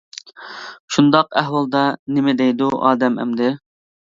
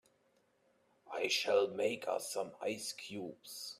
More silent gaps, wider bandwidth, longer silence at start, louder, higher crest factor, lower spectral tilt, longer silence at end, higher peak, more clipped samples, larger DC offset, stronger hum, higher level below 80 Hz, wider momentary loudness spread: first, 0.80-0.88 s, 1.99-2.06 s vs none; second, 7.8 kHz vs 15.5 kHz; second, 0.4 s vs 1.05 s; first, -17 LUFS vs -37 LUFS; about the same, 18 dB vs 22 dB; first, -5.5 dB/octave vs -2 dB/octave; first, 0.6 s vs 0.05 s; first, 0 dBFS vs -18 dBFS; neither; neither; neither; first, -64 dBFS vs -86 dBFS; first, 19 LU vs 14 LU